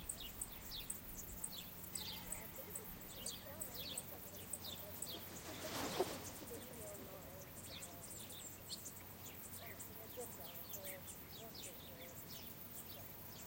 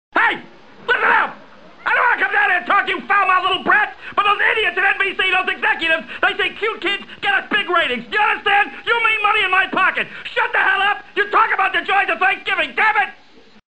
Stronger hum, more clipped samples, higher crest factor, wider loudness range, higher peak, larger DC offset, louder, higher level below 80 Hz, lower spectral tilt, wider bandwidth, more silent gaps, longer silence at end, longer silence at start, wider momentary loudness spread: neither; neither; first, 26 dB vs 16 dB; about the same, 4 LU vs 2 LU; second, -24 dBFS vs -2 dBFS; second, under 0.1% vs 0.7%; second, -48 LUFS vs -16 LUFS; second, -66 dBFS vs -56 dBFS; about the same, -2.5 dB/octave vs -3 dB/octave; first, 17 kHz vs 10 kHz; neither; second, 0 s vs 0.55 s; second, 0 s vs 0.15 s; about the same, 6 LU vs 6 LU